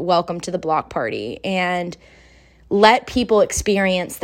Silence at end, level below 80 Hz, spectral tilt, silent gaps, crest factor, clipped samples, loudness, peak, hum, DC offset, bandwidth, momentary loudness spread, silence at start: 0.05 s; -44 dBFS; -4 dB/octave; none; 20 dB; under 0.1%; -19 LUFS; 0 dBFS; none; under 0.1%; 16 kHz; 11 LU; 0 s